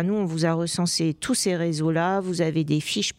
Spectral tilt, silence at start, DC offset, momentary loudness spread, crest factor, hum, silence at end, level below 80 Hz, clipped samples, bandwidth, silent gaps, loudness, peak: -4.5 dB/octave; 0 s; under 0.1%; 2 LU; 14 dB; none; 0.05 s; -60 dBFS; under 0.1%; 16 kHz; none; -24 LUFS; -10 dBFS